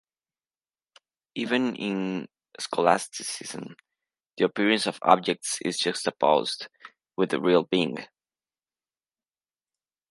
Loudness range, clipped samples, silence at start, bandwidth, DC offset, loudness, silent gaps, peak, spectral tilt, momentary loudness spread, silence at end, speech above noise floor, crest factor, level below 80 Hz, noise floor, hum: 4 LU; under 0.1%; 1.35 s; 11.5 kHz; under 0.1%; -26 LUFS; none; -2 dBFS; -4 dB/octave; 16 LU; 2.05 s; over 64 dB; 26 dB; -78 dBFS; under -90 dBFS; none